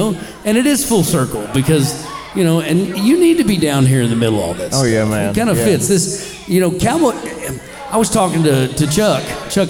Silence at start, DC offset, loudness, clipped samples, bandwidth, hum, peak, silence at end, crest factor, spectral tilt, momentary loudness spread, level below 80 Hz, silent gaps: 0 s; under 0.1%; -15 LUFS; under 0.1%; 19 kHz; none; -2 dBFS; 0 s; 12 dB; -5 dB/octave; 7 LU; -40 dBFS; none